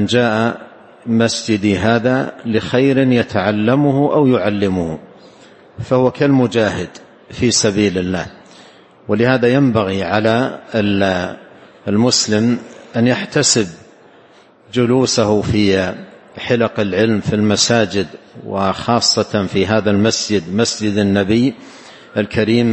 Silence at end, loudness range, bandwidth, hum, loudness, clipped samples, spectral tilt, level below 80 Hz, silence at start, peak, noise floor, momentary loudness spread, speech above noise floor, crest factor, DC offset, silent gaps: 0 s; 2 LU; 8.8 kHz; none; -15 LUFS; under 0.1%; -4.5 dB/octave; -48 dBFS; 0 s; 0 dBFS; -46 dBFS; 12 LU; 32 dB; 16 dB; under 0.1%; none